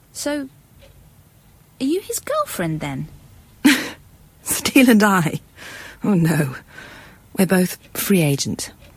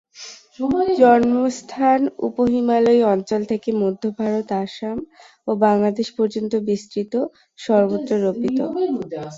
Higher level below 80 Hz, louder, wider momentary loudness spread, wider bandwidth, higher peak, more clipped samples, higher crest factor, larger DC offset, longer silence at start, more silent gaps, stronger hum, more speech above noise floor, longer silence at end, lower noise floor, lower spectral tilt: first, -52 dBFS vs -58 dBFS; about the same, -19 LUFS vs -20 LUFS; first, 21 LU vs 12 LU; first, 17 kHz vs 7.8 kHz; about the same, -2 dBFS vs -2 dBFS; neither; about the same, 20 dB vs 16 dB; neither; about the same, 0.15 s vs 0.15 s; neither; neither; first, 32 dB vs 22 dB; first, 0.25 s vs 0 s; first, -51 dBFS vs -41 dBFS; second, -4.5 dB/octave vs -6.5 dB/octave